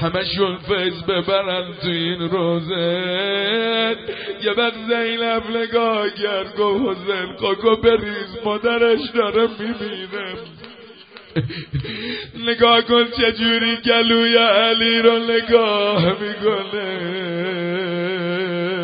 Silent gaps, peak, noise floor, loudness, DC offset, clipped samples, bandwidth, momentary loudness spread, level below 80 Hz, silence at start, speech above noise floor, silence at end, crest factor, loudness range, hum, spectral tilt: none; 0 dBFS; -42 dBFS; -19 LUFS; under 0.1%; under 0.1%; 5.2 kHz; 12 LU; -50 dBFS; 0 s; 23 dB; 0 s; 20 dB; 7 LU; none; -10 dB/octave